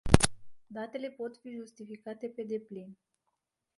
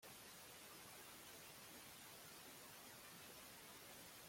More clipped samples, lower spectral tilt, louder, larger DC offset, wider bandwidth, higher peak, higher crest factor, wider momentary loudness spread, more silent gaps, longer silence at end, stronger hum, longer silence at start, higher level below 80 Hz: neither; first, -5 dB/octave vs -1.5 dB/octave; first, -34 LUFS vs -58 LUFS; neither; second, 11.5 kHz vs 16.5 kHz; first, 0 dBFS vs -46 dBFS; first, 34 dB vs 14 dB; first, 19 LU vs 0 LU; neither; first, 0.85 s vs 0 s; neither; about the same, 0.05 s vs 0 s; first, -42 dBFS vs -84 dBFS